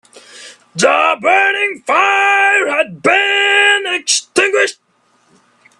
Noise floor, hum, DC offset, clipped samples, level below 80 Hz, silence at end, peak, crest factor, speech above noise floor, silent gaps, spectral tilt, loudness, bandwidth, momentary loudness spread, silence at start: -57 dBFS; none; under 0.1%; under 0.1%; -66 dBFS; 1.05 s; 0 dBFS; 14 dB; 45 dB; none; -1 dB/octave; -12 LUFS; 12.5 kHz; 6 LU; 0.15 s